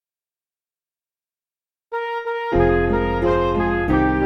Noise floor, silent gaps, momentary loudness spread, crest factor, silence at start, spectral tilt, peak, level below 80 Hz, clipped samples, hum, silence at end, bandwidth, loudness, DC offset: under -90 dBFS; none; 8 LU; 16 dB; 1.9 s; -8.5 dB/octave; -4 dBFS; -32 dBFS; under 0.1%; none; 0 s; 6.4 kHz; -20 LUFS; under 0.1%